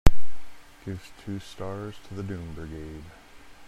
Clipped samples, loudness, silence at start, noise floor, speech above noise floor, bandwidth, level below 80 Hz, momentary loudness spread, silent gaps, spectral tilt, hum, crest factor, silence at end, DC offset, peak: under 0.1%; -36 LUFS; 0.05 s; -32 dBFS; -1 dB; 12.5 kHz; -34 dBFS; 16 LU; none; -6.5 dB/octave; none; 22 dB; 0 s; under 0.1%; 0 dBFS